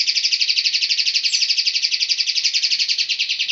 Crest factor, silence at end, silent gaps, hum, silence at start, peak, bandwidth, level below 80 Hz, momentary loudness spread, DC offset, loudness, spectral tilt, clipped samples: 18 dB; 0 s; none; none; 0 s; -2 dBFS; 8.4 kHz; -84 dBFS; 2 LU; under 0.1%; -16 LUFS; 6 dB/octave; under 0.1%